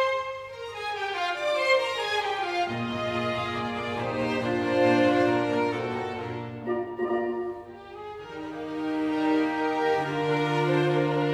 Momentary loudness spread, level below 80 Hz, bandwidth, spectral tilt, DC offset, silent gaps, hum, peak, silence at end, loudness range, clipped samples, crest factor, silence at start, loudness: 13 LU; -62 dBFS; 12.5 kHz; -6 dB/octave; under 0.1%; none; 50 Hz at -60 dBFS; -10 dBFS; 0 s; 5 LU; under 0.1%; 18 dB; 0 s; -27 LUFS